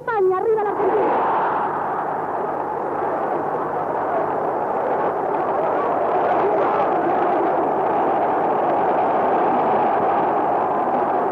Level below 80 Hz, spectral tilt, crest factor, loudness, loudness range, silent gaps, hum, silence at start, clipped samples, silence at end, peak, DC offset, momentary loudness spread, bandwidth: -62 dBFS; -8 dB/octave; 12 dB; -20 LUFS; 4 LU; none; none; 0 s; under 0.1%; 0 s; -8 dBFS; under 0.1%; 5 LU; 6.4 kHz